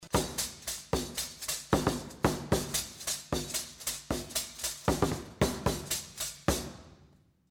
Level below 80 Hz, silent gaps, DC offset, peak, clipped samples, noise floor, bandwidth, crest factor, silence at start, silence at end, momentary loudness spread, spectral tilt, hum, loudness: -46 dBFS; none; under 0.1%; -14 dBFS; under 0.1%; -62 dBFS; over 20 kHz; 20 dB; 0 s; 0.45 s; 6 LU; -3.5 dB/octave; none; -33 LUFS